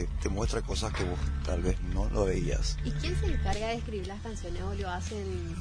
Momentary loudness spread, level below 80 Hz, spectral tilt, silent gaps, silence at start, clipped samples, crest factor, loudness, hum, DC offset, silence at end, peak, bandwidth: 7 LU; -34 dBFS; -5.5 dB/octave; none; 0 s; under 0.1%; 16 dB; -33 LUFS; none; under 0.1%; 0 s; -14 dBFS; 10.5 kHz